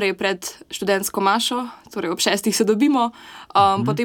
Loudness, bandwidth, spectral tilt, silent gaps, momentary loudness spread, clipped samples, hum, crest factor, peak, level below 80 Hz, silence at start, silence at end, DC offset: -20 LUFS; 17.5 kHz; -3.5 dB/octave; none; 11 LU; under 0.1%; none; 18 dB; -4 dBFS; -58 dBFS; 0 s; 0 s; under 0.1%